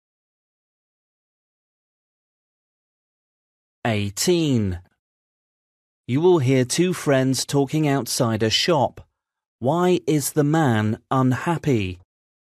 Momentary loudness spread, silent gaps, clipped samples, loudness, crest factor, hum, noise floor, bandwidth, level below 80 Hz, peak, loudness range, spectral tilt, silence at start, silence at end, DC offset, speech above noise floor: 7 LU; 4.99-6.03 s, 9.48-9.59 s; under 0.1%; -21 LUFS; 16 dB; none; under -90 dBFS; 14 kHz; -56 dBFS; -6 dBFS; 6 LU; -5 dB/octave; 3.85 s; 0.6 s; under 0.1%; over 70 dB